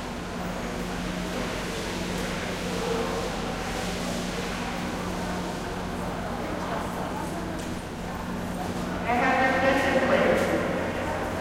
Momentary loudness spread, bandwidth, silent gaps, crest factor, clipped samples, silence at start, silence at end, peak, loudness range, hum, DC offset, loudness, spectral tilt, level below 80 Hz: 10 LU; 16 kHz; none; 18 dB; under 0.1%; 0 s; 0 s; -10 dBFS; 7 LU; none; under 0.1%; -28 LUFS; -5 dB/octave; -42 dBFS